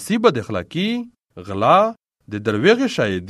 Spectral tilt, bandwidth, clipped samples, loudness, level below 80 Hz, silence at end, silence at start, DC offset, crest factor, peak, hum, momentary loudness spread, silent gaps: -5.5 dB/octave; 13.5 kHz; under 0.1%; -18 LUFS; -58 dBFS; 0 s; 0 s; under 0.1%; 18 dB; 0 dBFS; none; 16 LU; none